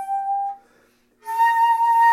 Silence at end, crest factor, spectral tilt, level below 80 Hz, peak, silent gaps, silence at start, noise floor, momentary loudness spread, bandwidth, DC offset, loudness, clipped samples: 0 s; 12 dB; 1.5 dB/octave; -74 dBFS; -8 dBFS; none; 0 s; -59 dBFS; 20 LU; 15.5 kHz; under 0.1%; -20 LUFS; under 0.1%